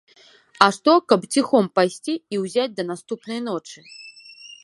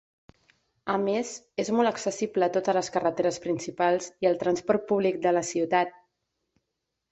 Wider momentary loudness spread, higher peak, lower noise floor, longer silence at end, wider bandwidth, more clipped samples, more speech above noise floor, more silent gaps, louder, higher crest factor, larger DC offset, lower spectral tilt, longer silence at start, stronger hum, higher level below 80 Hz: first, 23 LU vs 6 LU; first, 0 dBFS vs -10 dBFS; second, -52 dBFS vs -82 dBFS; second, 0.1 s vs 1.2 s; first, 11.5 kHz vs 8.2 kHz; neither; second, 32 dB vs 56 dB; neither; first, -21 LUFS vs -27 LUFS; about the same, 22 dB vs 18 dB; neither; about the same, -4.5 dB/octave vs -4.5 dB/octave; second, 0.6 s vs 0.85 s; neither; about the same, -70 dBFS vs -68 dBFS